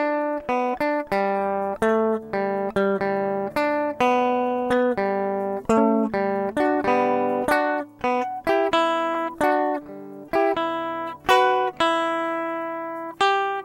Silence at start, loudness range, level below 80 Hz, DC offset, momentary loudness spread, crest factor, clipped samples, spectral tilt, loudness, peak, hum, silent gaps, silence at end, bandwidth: 0 s; 1 LU; -56 dBFS; under 0.1%; 6 LU; 20 dB; under 0.1%; -5 dB/octave; -23 LUFS; -4 dBFS; none; none; 0 s; 16.5 kHz